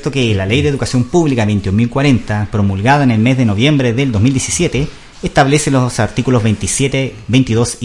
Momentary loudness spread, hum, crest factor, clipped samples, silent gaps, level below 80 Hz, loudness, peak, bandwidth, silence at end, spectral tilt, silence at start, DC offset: 5 LU; none; 12 dB; under 0.1%; none; -34 dBFS; -13 LUFS; 0 dBFS; 11.5 kHz; 0 s; -5.5 dB/octave; 0 s; under 0.1%